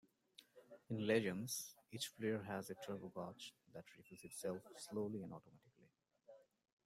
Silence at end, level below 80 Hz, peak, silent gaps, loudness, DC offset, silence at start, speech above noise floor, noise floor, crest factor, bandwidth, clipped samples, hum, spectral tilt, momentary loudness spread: 0.45 s; -84 dBFS; -24 dBFS; none; -46 LUFS; under 0.1%; 0.4 s; 30 dB; -75 dBFS; 24 dB; 16 kHz; under 0.1%; none; -4.5 dB/octave; 25 LU